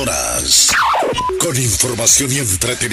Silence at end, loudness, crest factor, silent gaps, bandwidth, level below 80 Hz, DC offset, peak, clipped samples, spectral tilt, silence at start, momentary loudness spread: 0 s; -13 LUFS; 14 dB; none; 16 kHz; -36 dBFS; under 0.1%; -2 dBFS; under 0.1%; -2 dB/octave; 0 s; 7 LU